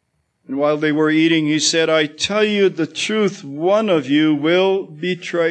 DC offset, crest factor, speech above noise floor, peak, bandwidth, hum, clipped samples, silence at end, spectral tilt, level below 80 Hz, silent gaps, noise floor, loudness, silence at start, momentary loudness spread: under 0.1%; 14 dB; 29 dB; -4 dBFS; 9.4 kHz; none; under 0.1%; 0 s; -4 dB/octave; -64 dBFS; none; -46 dBFS; -17 LUFS; 0.5 s; 7 LU